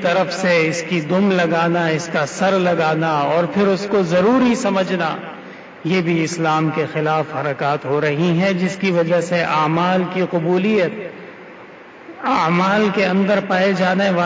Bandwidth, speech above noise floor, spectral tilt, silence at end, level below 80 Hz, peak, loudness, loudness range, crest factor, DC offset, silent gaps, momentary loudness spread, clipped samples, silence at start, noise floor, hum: 8 kHz; 22 dB; -6 dB/octave; 0 s; -58 dBFS; -6 dBFS; -17 LUFS; 3 LU; 12 dB; under 0.1%; none; 7 LU; under 0.1%; 0 s; -39 dBFS; none